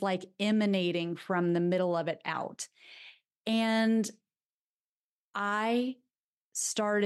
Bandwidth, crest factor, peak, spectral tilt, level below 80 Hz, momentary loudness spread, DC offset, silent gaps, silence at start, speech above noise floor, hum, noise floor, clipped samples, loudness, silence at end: 12.5 kHz; 16 dB; -16 dBFS; -4.5 dB/octave; -84 dBFS; 15 LU; under 0.1%; 3.37-3.44 s, 4.45-5.33 s, 6.20-6.52 s; 0 s; over 60 dB; none; under -90 dBFS; under 0.1%; -31 LUFS; 0 s